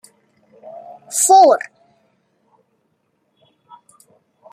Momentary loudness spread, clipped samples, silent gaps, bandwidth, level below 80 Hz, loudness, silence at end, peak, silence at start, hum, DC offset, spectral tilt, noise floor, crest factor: 29 LU; under 0.1%; none; 15.5 kHz; -78 dBFS; -12 LUFS; 2.95 s; -2 dBFS; 1.1 s; none; under 0.1%; -0.5 dB/octave; -67 dBFS; 18 dB